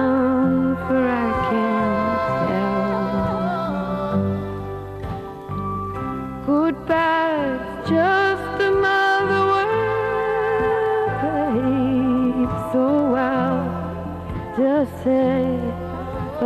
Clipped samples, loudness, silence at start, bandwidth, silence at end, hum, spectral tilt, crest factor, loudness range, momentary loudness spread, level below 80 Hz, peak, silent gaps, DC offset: under 0.1%; -21 LUFS; 0 s; 13 kHz; 0 s; none; -7.5 dB/octave; 12 dB; 5 LU; 10 LU; -42 dBFS; -8 dBFS; none; under 0.1%